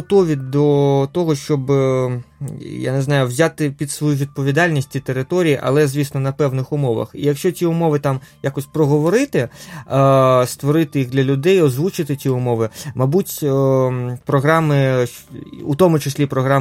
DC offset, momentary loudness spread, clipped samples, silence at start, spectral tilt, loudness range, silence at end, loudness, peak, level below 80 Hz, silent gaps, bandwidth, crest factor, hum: under 0.1%; 9 LU; under 0.1%; 0 s; -6.5 dB/octave; 3 LU; 0 s; -17 LUFS; 0 dBFS; -52 dBFS; none; 16 kHz; 16 dB; none